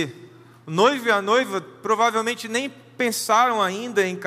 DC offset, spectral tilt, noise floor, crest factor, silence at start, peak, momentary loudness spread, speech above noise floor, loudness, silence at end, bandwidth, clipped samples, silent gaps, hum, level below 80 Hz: under 0.1%; -3.5 dB/octave; -46 dBFS; 18 dB; 0 s; -4 dBFS; 10 LU; 25 dB; -21 LUFS; 0 s; 15.5 kHz; under 0.1%; none; none; -80 dBFS